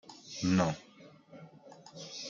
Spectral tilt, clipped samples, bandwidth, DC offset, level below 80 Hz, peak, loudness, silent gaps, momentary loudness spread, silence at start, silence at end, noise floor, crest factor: -5.5 dB/octave; under 0.1%; 7.6 kHz; under 0.1%; -70 dBFS; -14 dBFS; -33 LUFS; none; 25 LU; 0.05 s; 0 s; -57 dBFS; 22 dB